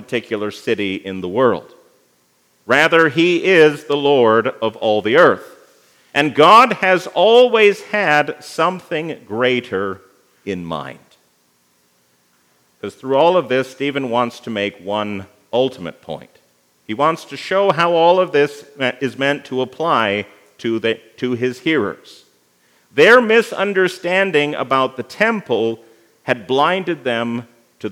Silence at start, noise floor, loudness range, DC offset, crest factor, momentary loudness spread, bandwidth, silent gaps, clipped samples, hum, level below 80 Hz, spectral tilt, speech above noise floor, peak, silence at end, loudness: 0 s; -60 dBFS; 9 LU; under 0.1%; 16 dB; 15 LU; 15.5 kHz; none; under 0.1%; 60 Hz at -55 dBFS; -70 dBFS; -5 dB/octave; 44 dB; 0 dBFS; 0 s; -16 LUFS